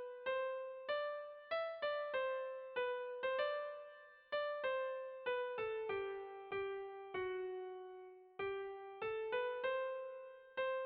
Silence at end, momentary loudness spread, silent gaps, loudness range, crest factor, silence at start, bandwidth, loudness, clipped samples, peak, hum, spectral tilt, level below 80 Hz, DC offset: 0 s; 9 LU; none; 3 LU; 14 dB; 0 s; 5 kHz; -43 LUFS; under 0.1%; -28 dBFS; none; -0.5 dB/octave; -80 dBFS; under 0.1%